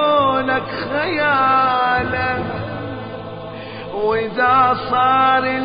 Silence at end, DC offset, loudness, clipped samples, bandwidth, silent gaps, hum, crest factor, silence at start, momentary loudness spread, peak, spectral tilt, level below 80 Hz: 0 s; under 0.1%; -17 LUFS; under 0.1%; 5.2 kHz; none; none; 14 dB; 0 s; 16 LU; -4 dBFS; -10 dB/octave; -44 dBFS